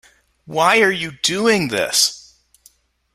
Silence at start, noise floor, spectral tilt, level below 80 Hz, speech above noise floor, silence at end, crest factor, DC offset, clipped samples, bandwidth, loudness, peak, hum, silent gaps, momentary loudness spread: 0.5 s; -55 dBFS; -2 dB/octave; -58 dBFS; 38 dB; 0.95 s; 18 dB; under 0.1%; under 0.1%; 16 kHz; -16 LUFS; -2 dBFS; none; none; 6 LU